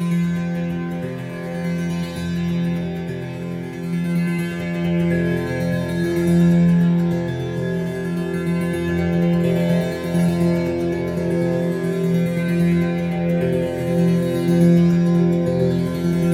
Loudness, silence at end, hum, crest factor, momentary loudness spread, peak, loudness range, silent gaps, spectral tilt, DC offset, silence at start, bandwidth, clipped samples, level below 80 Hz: -20 LUFS; 0 s; none; 14 dB; 9 LU; -4 dBFS; 6 LU; none; -8 dB/octave; under 0.1%; 0 s; 13.5 kHz; under 0.1%; -50 dBFS